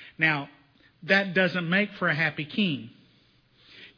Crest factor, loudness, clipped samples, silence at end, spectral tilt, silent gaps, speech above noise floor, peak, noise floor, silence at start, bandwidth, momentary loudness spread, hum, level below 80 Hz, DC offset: 20 dB; -25 LUFS; under 0.1%; 0.1 s; -6.5 dB/octave; none; 36 dB; -8 dBFS; -62 dBFS; 0 s; 5.4 kHz; 11 LU; none; -72 dBFS; under 0.1%